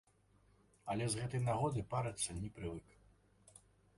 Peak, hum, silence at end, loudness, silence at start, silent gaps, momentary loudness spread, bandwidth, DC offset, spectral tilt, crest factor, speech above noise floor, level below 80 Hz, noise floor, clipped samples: -24 dBFS; none; 1.15 s; -40 LUFS; 0.85 s; none; 11 LU; 11.5 kHz; under 0.1%; -5 dB/octave; 18 dB; 32 dB; -62 dBFS; -71 dBFS; under 0.1%